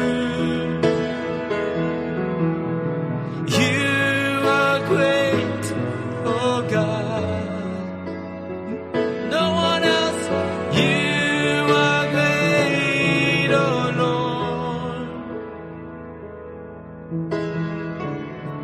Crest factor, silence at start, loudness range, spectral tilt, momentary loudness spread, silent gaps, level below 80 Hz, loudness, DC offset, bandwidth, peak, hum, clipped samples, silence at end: 18 dB; 0 s; 10 LU; -5.5 dB/octave; 14 LU; none; -52 dBFS; -21 LUFS; under 0.1%; 13 kHz; -4 dBFS; none; under 0.1%; 0 s